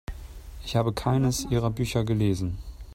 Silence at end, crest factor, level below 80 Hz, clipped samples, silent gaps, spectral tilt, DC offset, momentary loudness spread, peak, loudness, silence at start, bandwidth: 0 s; 18 dB; -40 dBFS; under 0.1%; none; -6 dB/octave; under 0.1%; 16 LU; -10 dBFS; -26 LUFS; 0.1 s; 16 kHz